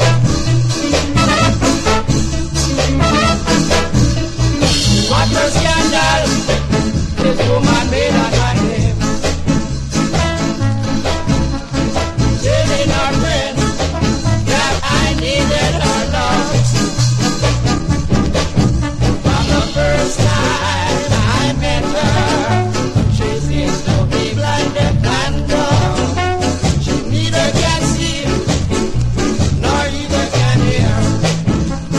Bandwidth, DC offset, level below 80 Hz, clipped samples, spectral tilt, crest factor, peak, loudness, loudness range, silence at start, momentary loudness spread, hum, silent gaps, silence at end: 13 kHz; under 0.1%; -22 dBFS; under 0.1%; -5 dB/octave; 14 dB; 0 dBFS; -15 LUFS; 2 LU; 0 s; 4 LU; none; none; 0 s